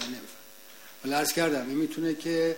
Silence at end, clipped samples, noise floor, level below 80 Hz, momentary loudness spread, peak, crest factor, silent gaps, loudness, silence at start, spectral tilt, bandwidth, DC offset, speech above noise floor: 0 s; under 0.1%; -50 dBFS; -68 dBFS; 21 LU; -14 dBFS; 16 dB; none; -29 LUFS; 0 s; -3.5 dB/octave; 16.5 kHz; 0.2%; 23 dB